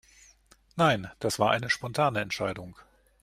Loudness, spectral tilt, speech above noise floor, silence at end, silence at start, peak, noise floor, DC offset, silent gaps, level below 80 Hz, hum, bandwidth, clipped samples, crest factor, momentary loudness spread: -27 LUFS; -4.5 dB/octave; 33 dB; 0.4 s; 0.75 s; -8 dBFS; -60 dBFS; under 0.1%; none; -60 dBFS; none; 15.5 kHz; under 0.1%; 20 dB; 15 LU